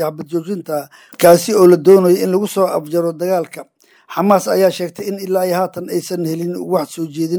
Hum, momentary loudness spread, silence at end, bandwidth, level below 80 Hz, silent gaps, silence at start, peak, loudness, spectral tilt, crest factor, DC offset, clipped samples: none; 14 LU; 0 s; over 20 kHz; -64 dBFS; none; 0 s; 0 dBFS; -15 LUFS; -6 dB/octave; 14 dB; under 0.1%; under 0.1%